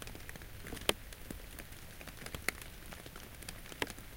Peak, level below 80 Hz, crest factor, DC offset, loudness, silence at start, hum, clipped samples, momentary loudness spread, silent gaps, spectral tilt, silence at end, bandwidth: -6 dBFS; -52 dBFS; 38 dB; under 0.1%; -43 LUFS; 0 s; none; under 0.1%; 13 LU; none; -2.5 dB/octave; 0 s; 17 kHz